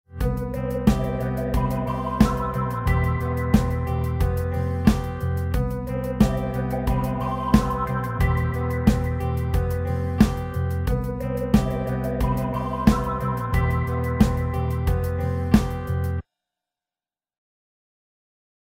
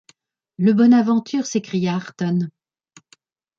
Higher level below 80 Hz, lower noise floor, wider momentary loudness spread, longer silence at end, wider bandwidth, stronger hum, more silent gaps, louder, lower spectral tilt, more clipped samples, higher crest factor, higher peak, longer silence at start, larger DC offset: first, -30 dBFS vs -68 dBFS; first, under -90 dBFS vs -58 dBFS; second, 6 LU vs 10 LU; first, 2.45 s vs 1.1 s; first, 16.5 kHz vs 7.4 kHz; neither; neither; second, -24 LUFS vs -19 LUFS; about the same, -7.5 dB/octave vs -6.5 dB/octave; neither; first, 22 dB vs 14 dB; first, -2 dBFS vs -6 dBFS; second, 0.1 s vs 0.6 s; neither